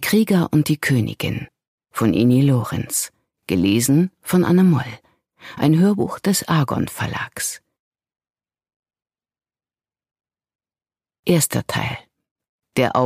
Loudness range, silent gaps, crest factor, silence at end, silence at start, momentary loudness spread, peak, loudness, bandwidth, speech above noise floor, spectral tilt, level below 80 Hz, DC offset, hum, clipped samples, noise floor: 10 LU; 1.67-1.78 s, 7.79-7.91 s, 8.76-8.83 s, 10.55-10.59 s, 11.19-11.23 s, 12.31-12.36 s, 12.49-12.59 s; 18 dB; 0 s; 0 s; 12 LU; -2 dBFS; -19 LUFS; 15.5 kHz; over 72 dB; -5.5 dB/octave; -52 dBFS; under 0.1%; none; under 0.1%; under -90 dBFS